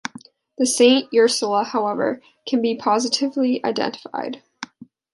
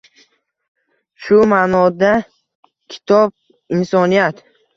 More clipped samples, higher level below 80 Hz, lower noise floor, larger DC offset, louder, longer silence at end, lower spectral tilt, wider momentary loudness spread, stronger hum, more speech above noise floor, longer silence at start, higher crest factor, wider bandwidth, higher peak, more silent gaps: neither; second, -72 dBFS vs -54 dBFS; second, -44 dBFS vs -56 dBFS; neither; second, -20 LUFS vs -14 LUFS; second, 0.3 s vs 0.45 s; second, -2.5 dB/octave vs -7 dB/octave; first, 18 LU vs 12 LU; neither; second, 25 dB vs 42 dB; second, 0.6 s vs 1.2 s; about the same, 18 dB vs 16 dB; first, 11.5 kHz vs 7.4 kHz; about the same, -2 dBFS vs 0 dBFS; second, none vs 2.55-2.63 s